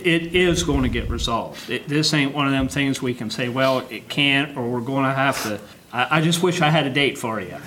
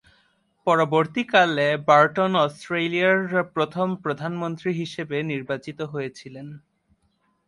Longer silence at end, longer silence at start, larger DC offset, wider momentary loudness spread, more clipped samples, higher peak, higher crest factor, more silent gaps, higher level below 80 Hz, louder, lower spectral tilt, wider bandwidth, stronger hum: second, 0 s vs 0.9 s; second, 0 s vs 0.65 s; neither; second, 9 LU vs 14 LU; neither; about the same, -2 dBFS vs -4 dBFS; about the same, 20 dB vs 20 dB; neither; first, -38 dBFS vs -68 dBFS; about the same, -21 LUFS vs -22 LUFS; second, -4.5 dB/octave vs -6 dB/octave; first, 17 kHz vs 11.5 kHz; neither